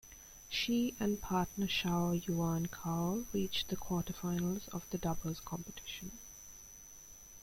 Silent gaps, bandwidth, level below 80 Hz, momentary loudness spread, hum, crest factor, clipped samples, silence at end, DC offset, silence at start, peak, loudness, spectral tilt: none; 16.5 kHz; -56 dBFS; 17 LU; none; 18 dB; under 0.1%; 0 s; under 0.1%; 0.05 s; -20 dBFS; -37 LUFS; -5 dB/octave